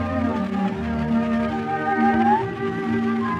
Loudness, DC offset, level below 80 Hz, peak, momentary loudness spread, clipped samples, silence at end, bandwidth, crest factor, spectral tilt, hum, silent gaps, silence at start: -22 LUFS; under 0.1%; -46 dBFS; -8 dBFS; 6 LU; under 0.1%; 0 s; 7.8 kHz; 14 dB; -8 dB/octave; none; none; 0 s